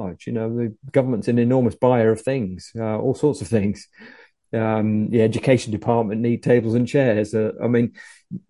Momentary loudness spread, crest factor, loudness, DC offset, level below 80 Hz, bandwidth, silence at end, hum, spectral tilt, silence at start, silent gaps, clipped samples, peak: 9 LU; 18 dB; -21 LUFS; under 0.1%; -52 dBFS; 11.5 kHz; 0.1 s; none; -7.5 dB/octave; 0 s; none; under 0.1%; -2 dBFS